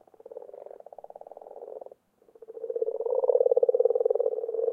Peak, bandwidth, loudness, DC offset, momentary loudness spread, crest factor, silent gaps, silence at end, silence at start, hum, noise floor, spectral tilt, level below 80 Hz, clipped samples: -10 dBFS; 1.6 kHz; -26 LUFS; under 0.1%; 23 LU; 20 dB; none; 0 s; 0.3 s; none; -59 dBFS; -7.5 dB/octave; -86 dBFS; under 0.1%